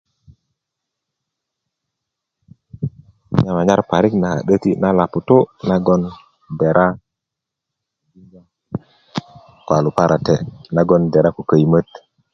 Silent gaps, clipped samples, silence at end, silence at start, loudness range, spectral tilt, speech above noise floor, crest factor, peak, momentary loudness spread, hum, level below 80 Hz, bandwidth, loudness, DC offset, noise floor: none; under 0.1%; 0.5 s; 2.8 s; 8 LU; -8 dB/octave; 67 dB; 18 dB; 0 dBFS; 15 LU; none; -46 dBFS; 7 kHz; -16 LUFS; under 0.1%; -82 dBFS